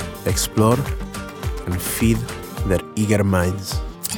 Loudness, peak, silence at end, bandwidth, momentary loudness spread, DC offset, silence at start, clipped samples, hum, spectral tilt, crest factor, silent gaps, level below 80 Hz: -21 LUFS; -4 dBFS; 0 s; over 20 kHz; 11 LU; under 0.1%; 0 s; under 0.1%; none; -5 dB/octave; 18 dB; none; -32 dBFS